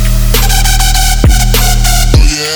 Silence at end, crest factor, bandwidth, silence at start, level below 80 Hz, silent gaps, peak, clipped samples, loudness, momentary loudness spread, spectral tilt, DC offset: 0 s; 6 dB; over 20 kHz; 0 s; -8 dBFS; none; 0 dBFS; 0.5%; -9 LUFS; 1 LU; -3 dB/octave; under 0.1%